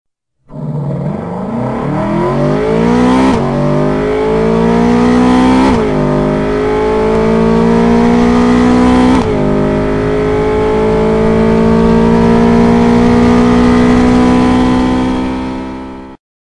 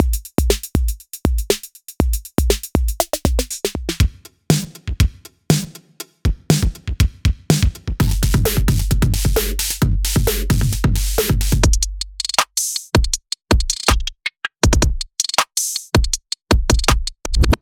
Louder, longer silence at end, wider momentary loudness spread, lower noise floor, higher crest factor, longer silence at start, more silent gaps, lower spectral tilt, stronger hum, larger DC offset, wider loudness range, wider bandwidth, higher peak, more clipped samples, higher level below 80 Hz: first, -10 LUFS vs -19 LUFS; first, 0.4 s vs 0.05 s; about the same, 9 LU vs 7 LU; about the same, -40 dBFS vs -38 dBFS; second, 10 dB vs 18 dB; first, 0.5 s vs 0 s; neither; first, -7.5 dB/octave vs -4 dB/octave; neither; neither; about the same, 4 LU vs 3 LU; second, 10.5 kHz vs over 20 kHz; about the same, 0 dBFS vs 0 dBFS; first, 0.6% vs under 0.1%; about the same, -24 dBFS vs -22 dBFS